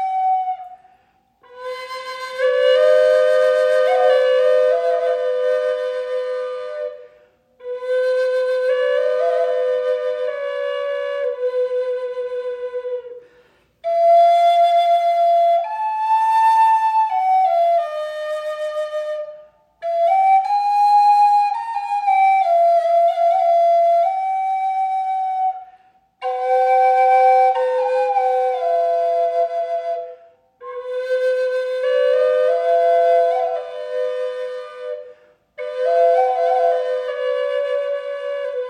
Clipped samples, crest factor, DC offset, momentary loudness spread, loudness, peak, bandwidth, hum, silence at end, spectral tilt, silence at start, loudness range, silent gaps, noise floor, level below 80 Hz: under 0.1%; 12 dB; under 0.1%; 14 LU; -18 LUFS; -4 dBFS; 9.8 kHz; none; 0 s; -0.5 dB/octave; 0 s; 6 LU; none; -59 dBFS; -74 dBFS